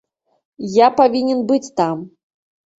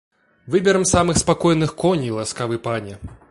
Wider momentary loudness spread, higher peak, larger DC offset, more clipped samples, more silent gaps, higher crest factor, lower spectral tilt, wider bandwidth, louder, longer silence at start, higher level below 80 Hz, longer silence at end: about the same, 12 LU vs 10 LU; about the same, -2 dBFS vs -2 dBFS; neither; neither; neither; about the same, 16 dB vs 18 dB; about the same, -5.5 dB/octave vs -4.5 dB/octave; second, 8 kHz vs 11.5 kHz; first, -16 LUFS vs -19 LUFS; first, 0.6 s vs 0.45 s; second, -62 dBFS vs -40 dBFS; first, 0.7 s vs 0.15 s